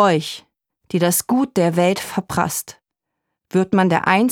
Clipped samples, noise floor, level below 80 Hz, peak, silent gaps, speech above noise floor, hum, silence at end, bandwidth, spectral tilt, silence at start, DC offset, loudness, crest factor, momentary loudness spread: under 0.1%; -80 dBFS; -54 dBFS; -2 dBFS; none; 62 dB; none; 0 s; 19 kHz; -5 dB/octave; 0 s; under 0.1%; -19 LUFS; 18 dB; 10 LU